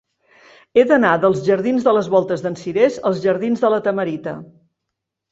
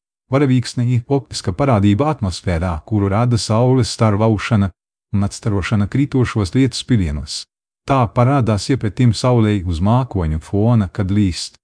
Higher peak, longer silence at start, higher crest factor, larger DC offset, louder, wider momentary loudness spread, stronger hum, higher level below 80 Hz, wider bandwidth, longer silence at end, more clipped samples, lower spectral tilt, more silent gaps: about the same, -2 dBFS vs 0 dBFS; first, 0.75 s vs 0.3 s; about the same, 16 dB vs 16 dB; neither; about the same, -17 LUFS vs -17 LUFS; first, 9 LU vs 6 LU; neither; second, -60 dBFS vs -34 dBFS; second, 7.8 kHz vs 10.5 kHz; first, 0.9 s vs 0.15 s; neither; about the same, -6.5 dB/octave vs -6.5 dB/octave; neither